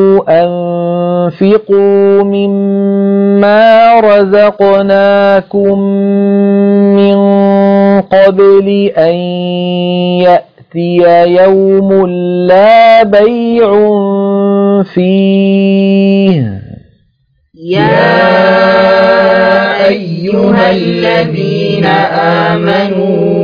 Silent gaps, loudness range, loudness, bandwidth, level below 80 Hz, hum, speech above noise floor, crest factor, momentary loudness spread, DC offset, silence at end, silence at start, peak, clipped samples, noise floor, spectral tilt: none; 3 LU; -7 LUFS; 5.2 kHz; -48 dBFS; none; 48 dB; 8 dB; 7 LU; under 0.1%; 0 s; 0 s; 0 dBFS; 1%; -55 dBFS; -9 dB/octave